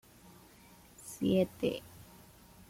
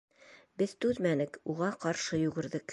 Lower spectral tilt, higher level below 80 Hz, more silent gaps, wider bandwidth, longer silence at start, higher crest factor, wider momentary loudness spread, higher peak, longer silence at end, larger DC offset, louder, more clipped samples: about the same, -6 dB/octave vs -5.5 dB/octave; about the same, -64 dBFS vs -66 dBFS; neither; first, 16.5 kHz vs 11.5 kHz; first, 1 s vs 0.3 s; about the same, 20 dB vs 18 dB; first, 26 LU vs 5 LU; about the same, -18 dBFS vs -16 dBFS; first, 0.65 s vs 0 s; neither; about the same, -33 LUFS vs -33 LUFS; neither